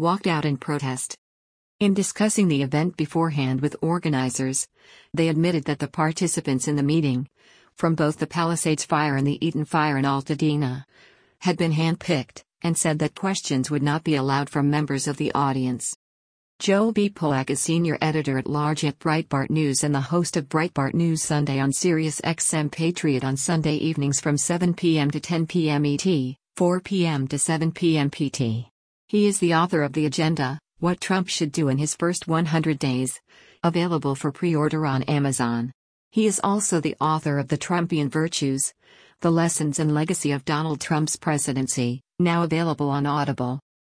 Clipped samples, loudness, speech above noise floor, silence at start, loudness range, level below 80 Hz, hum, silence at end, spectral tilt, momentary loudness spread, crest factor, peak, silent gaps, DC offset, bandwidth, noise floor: under 0.1%; -23 LUFS; over 67 dB; 0 s; 1 LU; -60 dBFS; none; 0.3 s; -5 dB/octave; 5 LU; 16 dB; -8 dBFS; 1.18-1.79 s, 15.96-16.59 s, 28.71-29.08 s, 35.74-36.11 s; under 0.1%; 10.5 kHz; under -90 dBFS